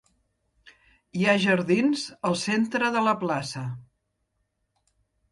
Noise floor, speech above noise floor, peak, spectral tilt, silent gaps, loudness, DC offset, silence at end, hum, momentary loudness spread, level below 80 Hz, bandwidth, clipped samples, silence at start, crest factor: -76 dBFS; 52 dB; -8 dBFS; -5 dB/octave; none; -24 LUFS; under 0.1%; 1.5 s; none; 13 LU; -66 dBFS; 11.5 kHz; under 0.1%; 1.15 s; 18 dB